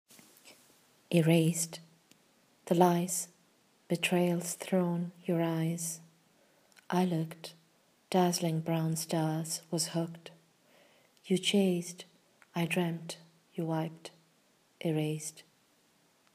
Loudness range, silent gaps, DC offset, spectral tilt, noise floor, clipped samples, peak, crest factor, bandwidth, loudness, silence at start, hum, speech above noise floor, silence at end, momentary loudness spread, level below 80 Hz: 5 LU; none; under 0.1%; -5 dB/octave; -69 dBFS; under 0.1%; -10 dBFS; 24 dB; 15.5 kHz; -32 LUFS; 0.45 s; none; 38 dB; 0.95 s; 18 LU; -86 dBFS